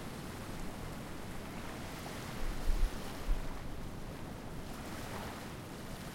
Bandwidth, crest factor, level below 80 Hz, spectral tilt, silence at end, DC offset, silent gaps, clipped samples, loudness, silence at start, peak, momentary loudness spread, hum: 16.5 kHz; 20 dB; -42 dBFS; -5 dB/octave; 0 s; under 0.1%; none; under 0.1%; -44 LUFS; 0 s; -18 dBFS; 6 LU; none